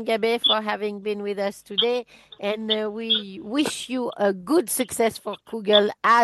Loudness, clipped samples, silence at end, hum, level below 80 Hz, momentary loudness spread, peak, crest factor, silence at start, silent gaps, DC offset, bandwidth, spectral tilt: -23 LUFS; under 0.1%; 0 s; none; -66 dBFS; 10 LU; -2 dBFS; 22 dB; 0 s; none; under 0.1%; 12.5 kHz; -3 dB/octave